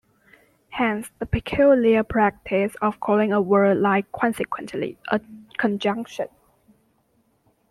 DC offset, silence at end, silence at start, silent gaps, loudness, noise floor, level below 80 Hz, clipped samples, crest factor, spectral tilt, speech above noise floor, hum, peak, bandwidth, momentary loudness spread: under 0.1%; 1.45 s; 0.7 s; none; -22 LUFS; -65 dBFS; -48 dBFS; under 0.1%; 18 dB; -6.5 dB/octave; 44 dB; none; -4 dBFS; 14 kHz; 12 LU